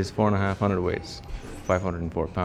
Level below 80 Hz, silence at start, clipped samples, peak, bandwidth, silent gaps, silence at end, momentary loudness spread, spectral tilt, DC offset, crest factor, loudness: -42 dBFS; 0 s; under 0.1%; -8 dBFS; 11.5 kHz; none; 0 s; 14 LU; -7 dB/octave; under 0.1%; 18 dB; -26 LUFS